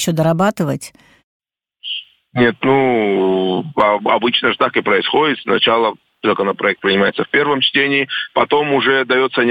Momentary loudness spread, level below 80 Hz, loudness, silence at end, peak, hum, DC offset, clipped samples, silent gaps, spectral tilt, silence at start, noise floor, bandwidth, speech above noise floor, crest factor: 8 LU; -56 dBFS; -15 LUFS; 0 s; 0 dBFS; none; under 0.1%; under 0.1%; 1.24-1.40 s; -5 dB/octave; 0 s; -35 dBFS; 17.5 kHz; 20 dB; 16 dB